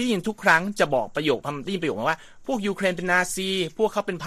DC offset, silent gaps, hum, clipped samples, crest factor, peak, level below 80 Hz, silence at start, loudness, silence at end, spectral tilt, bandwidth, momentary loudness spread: under 0.1%; none; none; under 0.1%; 20 dB; -4 dBFS; -54 dBFS; 0 s; -24 LUFS; 0 s; -4 dB/octave; 15 kHz; 8 LU